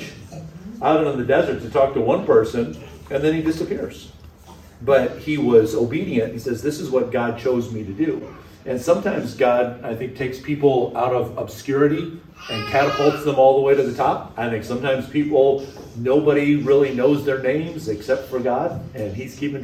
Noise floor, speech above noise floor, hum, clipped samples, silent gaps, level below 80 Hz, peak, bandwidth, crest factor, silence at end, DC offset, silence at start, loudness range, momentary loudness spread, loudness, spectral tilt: -44 dBFS; 24 dB; none; under 0.1%; none; -50 dBFS; -2 dBFS; 15 kHz; 18 dB; 0 s; under 0.1%; 0 s; 3 LU; 13 LU; -20 LUFS; -6.5 dB/octave